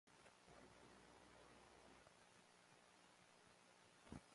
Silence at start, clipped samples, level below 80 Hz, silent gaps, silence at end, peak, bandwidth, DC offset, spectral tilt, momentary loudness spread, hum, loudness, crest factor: 0.05 s; under 0.1%; -80 dBFS; none; 0 s; -44 dBFS; 11.5 kHz; under 0.1%; -4 dB/octave; 6 LU; none; -67 LUFS; 24 dB